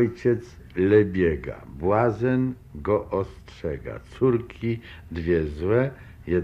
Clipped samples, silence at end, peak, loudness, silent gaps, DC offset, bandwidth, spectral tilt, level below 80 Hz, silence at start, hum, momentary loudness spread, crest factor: under 0.1%; 0 s; -6 dBFS; -25 LUFS; none; under 0.1%; 7.4 kHz; -9 dB/octave; -46 dBFS; 0 s; none; 15 LU; 18 dB